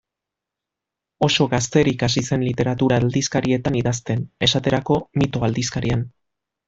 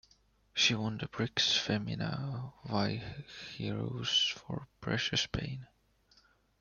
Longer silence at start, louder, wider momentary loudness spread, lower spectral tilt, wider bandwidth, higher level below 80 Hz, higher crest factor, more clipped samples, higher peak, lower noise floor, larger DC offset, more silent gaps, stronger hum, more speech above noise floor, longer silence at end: first, 1.2 s vs 0.55 s; first, -20 LUFS vs -33 LUFS; second, 5 LU vs 14 LU; first, -5 dB/octave vs -3.5 dB/octave; first, 8 kHz vs 7.2 kHz; first, -46 dBFS vs -60 dBFS; about the same, 18 dB vs 22 dB; neither; first, -2 dBFS vs -14 dBFS; first, -85 dBFS vs -69 dBFS; neither; neither; neither; first, 65 dB vs 34 dB; second, 0.6 s vs 0.95 s